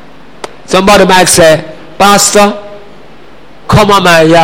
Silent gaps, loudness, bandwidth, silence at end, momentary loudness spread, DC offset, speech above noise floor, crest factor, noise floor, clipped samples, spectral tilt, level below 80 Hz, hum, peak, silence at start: none; -5 LUFS; over 20 kHz; 0 s; 22 LU; 4%; 31 dB; 8 dB; -35 dBFS; 2%; -3.5 dB/octave; -32 dBFS; none; 0 dBFS; 0.45 s